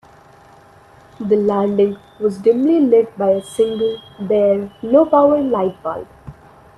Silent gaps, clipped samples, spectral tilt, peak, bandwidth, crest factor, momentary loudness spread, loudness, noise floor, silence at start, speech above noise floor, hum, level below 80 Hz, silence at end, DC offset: none; under 0.1%; -7.5 dB/octave; 0 dBFS; 12 kHz; 16 dB; 13 LU; -16 LUFS; -46 dBFS; 1.2 s; 30 dB; none; -54 dBFS; 0.45 s; under 0.1%